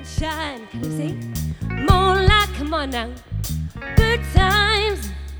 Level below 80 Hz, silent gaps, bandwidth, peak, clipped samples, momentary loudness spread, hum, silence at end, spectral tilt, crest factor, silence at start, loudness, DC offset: -26 dBFS; none; over 20 kHz; 0 dBFS; under 0.1%; 13 LU; none; 0 s; -5 dB/octave; 20 dB; 0 s; -20 LUFS; under 0.1%